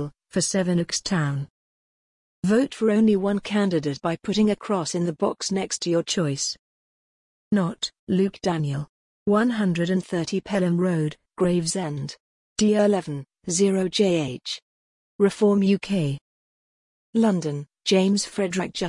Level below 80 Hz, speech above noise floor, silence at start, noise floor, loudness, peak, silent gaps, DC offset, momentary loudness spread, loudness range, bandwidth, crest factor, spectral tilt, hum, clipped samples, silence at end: -60 dBFS; over 67 dB; 0 s; under -90 dBFS; -24 LUFS; -8 dBFS; 1.50-2.42 s, 6.59-7.51 s, 7.99-8.07 s, 8.89-9.26 s, 12.20-12.56 s, 14.62-15.19 s, 16.21-17.13 s; under 0.1%; 11 LU; 3 LU; 11 kHz; 16 dB; -5 dB/octave; none; under 0.1%; 0 s